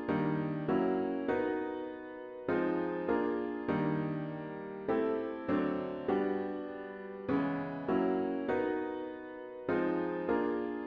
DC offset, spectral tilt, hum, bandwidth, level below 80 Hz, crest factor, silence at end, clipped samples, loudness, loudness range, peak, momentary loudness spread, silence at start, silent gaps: under 0.1%; -9.5 dB/octave; none; 5.2 kHz; -66 dBFS; 14 dB; 0 s; under 0.1%; -35 LUFS; 1 LU; -20 dBFS; 10 LU; 0 s; none